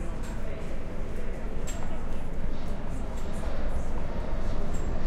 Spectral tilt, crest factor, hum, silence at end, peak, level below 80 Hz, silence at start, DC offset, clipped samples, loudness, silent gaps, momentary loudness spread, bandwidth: -6.5 dB/octave; 10 dB; none; 0 s; -14 dBFS; -30 dBFS; 0 s; under 0.1%; under 0.1%; -36 LUFS; none; 3 LU; 8.4 kHz